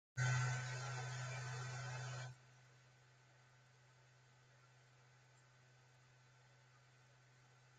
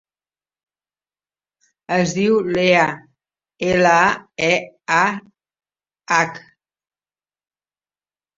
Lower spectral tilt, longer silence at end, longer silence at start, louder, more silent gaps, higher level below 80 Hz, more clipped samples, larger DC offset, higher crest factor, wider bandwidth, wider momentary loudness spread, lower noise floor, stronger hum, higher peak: about the same, -4 dB/octave vs -4.5 dB/octave; second, 0.1 s vs 2 s; second, 0.15 s vs 1.9 s; second, -45 LUFS vs -17 LUFS; neither; second, -78 dBFS vs -58 dBFS; neither; neither; about the same, 22 dB vs 20 dB; first, 9.2 kHz vs 7.8 kHz; first, 27 LU vs 9 LU; second, -69 dBFS vs under -90 dBFS; second, none vs 50 Hz at -55 dBFS; second, -28 dBFS vs -2 dBFS